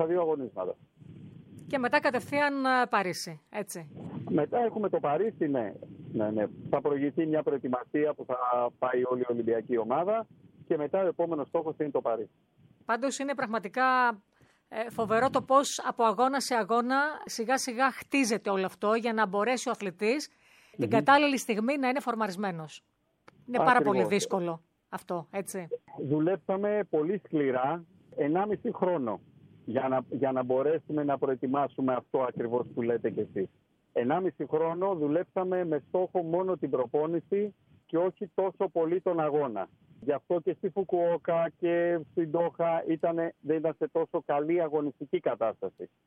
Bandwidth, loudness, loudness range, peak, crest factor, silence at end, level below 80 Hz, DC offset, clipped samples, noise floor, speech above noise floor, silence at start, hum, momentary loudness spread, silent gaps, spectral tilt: 16 kHz; -29 LUFS; 3 LU; -8 dBFS; 22 dB; 0.2 s; -76 dBFS; under 0.1%; under 0.1%; -62 dBFS; 33 dB; 0 s; none; 11 LU; none; -5 dB/octave